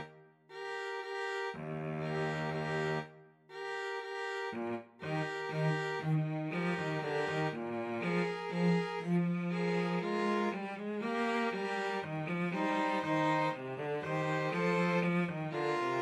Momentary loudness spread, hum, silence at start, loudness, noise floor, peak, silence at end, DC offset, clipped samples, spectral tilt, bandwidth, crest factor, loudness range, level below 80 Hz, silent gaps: 8 LU; none; 0 s; -35 LUFS; -57 dBFS; -20 dBFS; 0 s; under 0.1%; under 0.1%; -7 dB/octave; 11 kHz; 14 dB; 5 LU; -78 dBFS; none